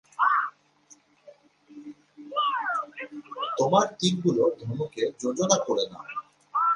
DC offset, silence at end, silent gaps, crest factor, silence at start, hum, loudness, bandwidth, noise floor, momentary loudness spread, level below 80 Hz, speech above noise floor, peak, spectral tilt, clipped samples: under 0.1%; 0 s; none; 22 dB; 0.2 s; none; -26 LUFS; 11 kHz; -58 dBFS; 16 LU; -70 dBFS; 33 dB; -6 dBFS; -4 dB/octave; under 0.1%